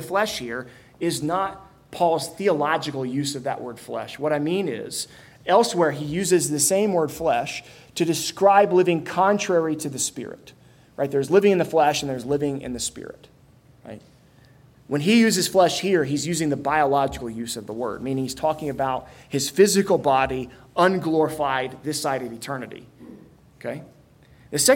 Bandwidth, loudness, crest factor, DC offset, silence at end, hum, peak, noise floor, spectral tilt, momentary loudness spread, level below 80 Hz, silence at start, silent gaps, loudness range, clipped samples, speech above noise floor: 16.5 kHz; -22 LUFS; 20 dB; under 0.1%; 0 s; none; -4 dBFS; -53 dBFS; -4 dB/octave; 15 LU; -56 dBFS; 0 s; none; 4 LU; under 0.1%; 31 dB